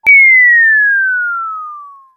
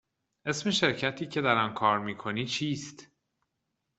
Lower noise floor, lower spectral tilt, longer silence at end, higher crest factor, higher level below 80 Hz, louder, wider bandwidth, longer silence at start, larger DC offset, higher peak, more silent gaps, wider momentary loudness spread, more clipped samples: second, -31 dBFS vs -82 dBFS; second, -1.5 dB/octave vs -4 dB/octave; second, 0.25 s vs 0.95 s; second, 10 dB vs 24 dB; about the same, -64 dBFS vs -68 dBFS; first, -6 LUFS vs -29 LUFS; first, 15.5 kHz vs 8.4 kHz; second, 0.05 s vs 0.45 s; neither; first, 0 dBFS vs -8 dBFS; neither; first, 19 LU vs 9 LU; neither